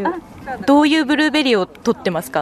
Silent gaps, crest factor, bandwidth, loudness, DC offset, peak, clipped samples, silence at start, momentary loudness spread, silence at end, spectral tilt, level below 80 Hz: none; 12 dB; 13.5 kHz; -16 LUFS; under 0.1%; -4 dBFS; under 0.1%; 0 s; 11 LU; 0 s; -4.5 dB/octave; -52 dBFS